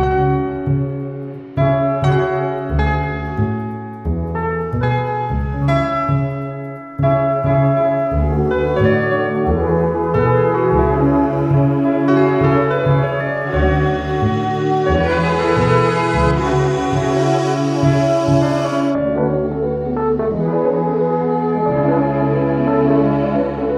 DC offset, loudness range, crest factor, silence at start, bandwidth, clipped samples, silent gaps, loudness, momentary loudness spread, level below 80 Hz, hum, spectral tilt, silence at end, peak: under 0.1%; 4 LU; 14 dB; 0 s; 9.6 kHz; under 0.1%; none; -17 LUFS; 6 LU; -30 dBFS; none; -8 dB/octave; 0 s; -2 dBFS